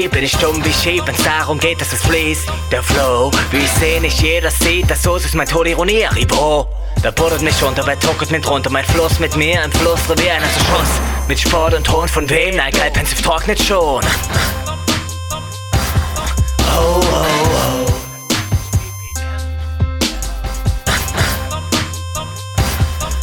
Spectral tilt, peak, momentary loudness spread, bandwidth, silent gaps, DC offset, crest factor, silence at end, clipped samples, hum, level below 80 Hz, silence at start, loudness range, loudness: -4 dB/octave; 0 dBFS; 7 LU; 19.5 kHz; none; under 0.1%; 14 dB; 0 s; under 0.1%; none; -22 dBFS; 0 s; 5 LU; -15 LUFS